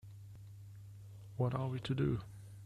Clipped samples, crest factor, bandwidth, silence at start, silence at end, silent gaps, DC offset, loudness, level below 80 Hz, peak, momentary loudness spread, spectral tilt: under 0.1%; 18 dB; 12.5 kHz; 0.05 s; 0 s; none; under 0.1%; -38 LUFS; -60 dBFS; -22 dBFS; 18 LU; -8 dB/octave